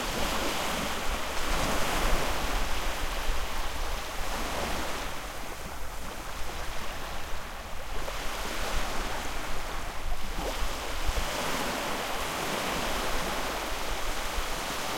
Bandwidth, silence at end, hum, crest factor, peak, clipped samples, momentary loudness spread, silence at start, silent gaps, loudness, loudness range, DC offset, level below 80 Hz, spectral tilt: 16.5 kHz; 0 s; none; 18 dB; -12 dBFS; under 0.1%; 9 LU; 0 s; none; -33 LUFS; 6 LU; under 0.1%; -36 dBFS; -3 dB/octave